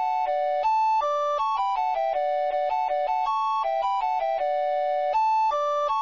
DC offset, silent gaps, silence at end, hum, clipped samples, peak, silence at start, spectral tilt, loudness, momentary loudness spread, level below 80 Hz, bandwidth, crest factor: 0.2%; none; 0 s; none; under 0.1%; -16 dBFS; 0 s; -1 dB/octave; -25 LUFS; 3 LU; -60 dBFS; 7.4 kHz; 8 dB